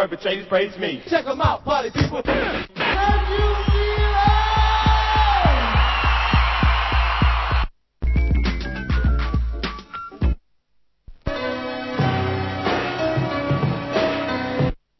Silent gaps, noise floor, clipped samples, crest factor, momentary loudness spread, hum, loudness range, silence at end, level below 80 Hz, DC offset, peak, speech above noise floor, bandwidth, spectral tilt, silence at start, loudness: none; -63 dBFS; under 0.1%; 16 dB; 9 LU; none; 8 LU; 0.25 s; -24 dBFS; under 0.1%; -4 dBFS; 42 dB; 6 kHz; -6.5 dB/octave; 0 s; -21 LUFS